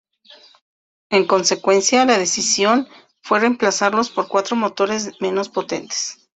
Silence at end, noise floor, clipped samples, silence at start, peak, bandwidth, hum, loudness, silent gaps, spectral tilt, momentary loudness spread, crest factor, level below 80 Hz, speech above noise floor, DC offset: 0.2 s; -48 dBFS; under 0.1%; 1.1 s; -2 dBFS; 8.4 kHz; none; -18 LUFS; none; -2.5 dB/octave; 9 LU; 18 dB; -64 dBFS; 30 dB; under 0.1%